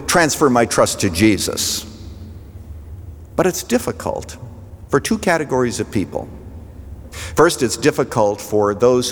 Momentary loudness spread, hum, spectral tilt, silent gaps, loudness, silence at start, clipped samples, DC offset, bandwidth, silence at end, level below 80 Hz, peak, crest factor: 22 LU; none; -4 dB/octave; none; -17 LUFS; 0 s; under 0.1%; under 0.1%; over 20 kHz; 0 s; -40 dBFS; -2 dBFS; 18 dB